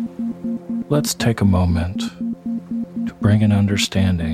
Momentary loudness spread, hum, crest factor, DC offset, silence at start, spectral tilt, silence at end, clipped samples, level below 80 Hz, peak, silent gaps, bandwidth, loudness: 10 LU; none; 16 dB; under 0.1%; 0 s; -6 dB/octave; 0 s; under 0.1%; -38 dBFS; -2 dBFS; none; 15 kHz; -20 LUFS